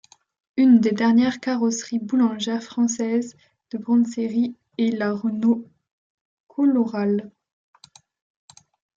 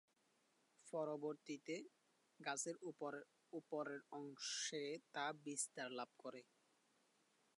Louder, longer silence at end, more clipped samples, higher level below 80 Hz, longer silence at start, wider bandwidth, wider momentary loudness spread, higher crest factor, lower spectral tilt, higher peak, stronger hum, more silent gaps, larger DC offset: first, -22 LUFS vs -49 LUFS; first, 1.7 s vs 1.15 s; neither; first, -70 dBFS vs under -90 dBFS; second, 0.55 s vs 0.8 s; second, 7.6 kHz vs 11 kHz; about the same, 10 LU vs 11 LU; about the same, 16 dB vs 20 dB; first, -5 dB/octave vs -2.5 dB/octave; first, -6 dBFS vs -32 dBFS; neither; first, 5.91-6.47 s vs none; neither